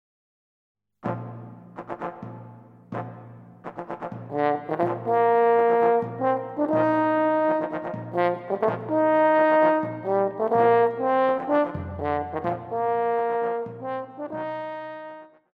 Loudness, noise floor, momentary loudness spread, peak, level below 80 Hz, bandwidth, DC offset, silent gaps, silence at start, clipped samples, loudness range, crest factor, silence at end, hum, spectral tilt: -24 LUFS; -46 dBFS; 19 LU; -8 dBFS; -60 dBFS; 5 kHz; under 0.1%; none; 1.05 s; under 0.1%; 15 LU; 16 dB; 0.3 s; none; -9 dB/octave